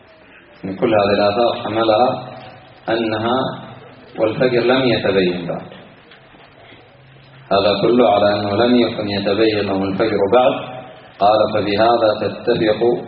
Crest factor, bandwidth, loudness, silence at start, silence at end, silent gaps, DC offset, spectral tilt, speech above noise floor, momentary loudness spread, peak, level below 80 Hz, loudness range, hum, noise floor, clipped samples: 18 dB; 5.2 kHz; -16 LUFS; 0.65 s; 0 s; none; under 0.1%; -4 dB/octave; 29 dB; 15 LU; 0 dBFS; -52 dBFS; 4 LU; none; -45 dBFS; under 0.1%